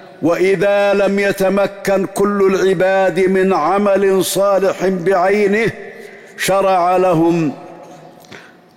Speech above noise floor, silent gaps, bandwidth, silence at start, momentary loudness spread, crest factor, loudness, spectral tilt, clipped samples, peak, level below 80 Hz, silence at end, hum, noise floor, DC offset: 26 dB; none; 16.5 kHz; 0 s; 6 LU; 10 dB; -14 LUFS; -5.5 dB/octave; under 0.1%; -6 dBFS; -52 dBFS; 0.35 s; none; -39 dBFS; under 0.1%